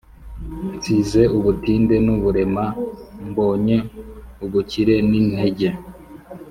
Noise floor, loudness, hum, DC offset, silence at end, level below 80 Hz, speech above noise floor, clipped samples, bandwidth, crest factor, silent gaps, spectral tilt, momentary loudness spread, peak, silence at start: -38 dBFS; -19 LUFS; none; under 0.1%; 0 s; -38 dBFS; 20 dB; under 0.1%; 14.5 kHz; 16 dB; none; -7.5 dB/octave; 19 LU; -2 dBFS; 0.2 s